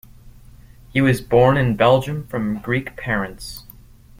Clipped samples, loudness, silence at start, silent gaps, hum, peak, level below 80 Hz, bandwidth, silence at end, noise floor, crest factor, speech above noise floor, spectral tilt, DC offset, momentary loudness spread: under 0.1%; -19 LUFS; 0.25 s; none; none; -2 dBFS; -42 dBFS; 16.5 kHz; 0.6 s; -44 dBFS; 18 dB; 26 dB; -7 dB/octave; under 0.1%; 15 LU